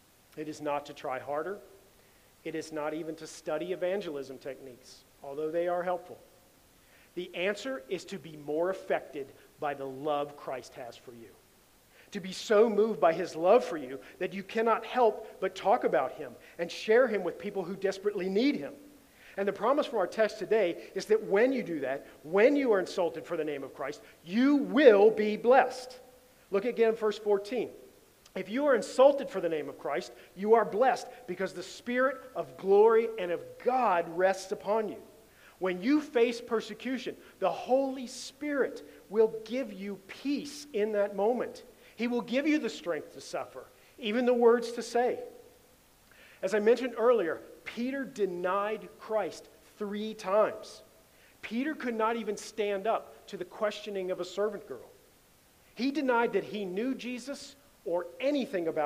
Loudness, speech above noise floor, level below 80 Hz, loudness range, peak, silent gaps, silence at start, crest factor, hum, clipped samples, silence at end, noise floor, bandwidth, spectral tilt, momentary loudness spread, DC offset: -30 LUFS; 32 dB; -72 dBFS; 9 LU; -8 dBFS; none; 0.35 s; 24 dB; none; under 0.1%; 0 s; -62 dBFS; 15.5 kHz; -5 dB/octave; 17 LU; under 0.1%